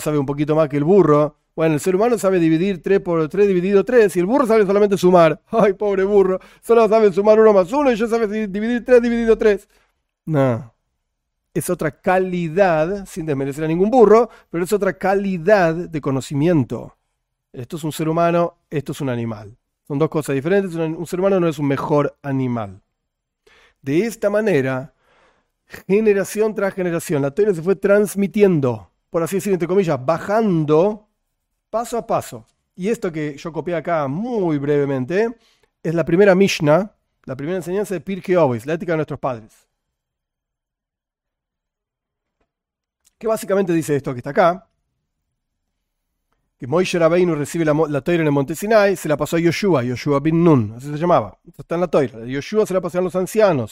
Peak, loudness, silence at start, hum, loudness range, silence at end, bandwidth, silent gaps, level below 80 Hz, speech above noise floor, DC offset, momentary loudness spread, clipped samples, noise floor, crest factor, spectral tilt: 0 dBFS; -18 LUFS; 0 s; none; 8 LU; 0.05 s; 16 kHz; none; -50 dBFS; 68 dB; under 0.1%; 12 LU; under 0.1%; -86 dBFS; 18 dB; -6.5 dB/octave